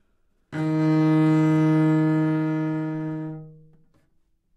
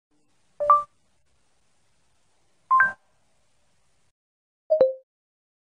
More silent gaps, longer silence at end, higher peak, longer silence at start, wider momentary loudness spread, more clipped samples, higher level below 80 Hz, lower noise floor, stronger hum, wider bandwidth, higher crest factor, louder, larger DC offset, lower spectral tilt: second, none vs 4.11-4.70 s; first, 1.05 s vs 0.8 s; second, -12 dBFS vs -6 dBFS; about the same, 0.5 s vs 0.6 s; second, 14 LU vs 21 LU; neither; about the same, -68 dBFS vs -72 dBFS; second, -65 dBFS vs -70 dBFS; neither; second, 8.2 kHz vs 9.8 kHz; second, 12 dB vs 22 dB; about the same, -22 LUFS vs -22 LUFS; neither; first, -9 dB/octave vs -5 dB/octave